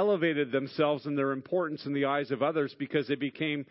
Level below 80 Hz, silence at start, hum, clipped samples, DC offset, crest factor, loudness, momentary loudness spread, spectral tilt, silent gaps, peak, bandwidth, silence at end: -78 dBFS; 0 s; none; under 0.1%; under 0.1%; 16 dB; -30 LUFS; 4 LU; -10 dB/octave; none; -14 dBFS; 5.8 kHz; 0.05 s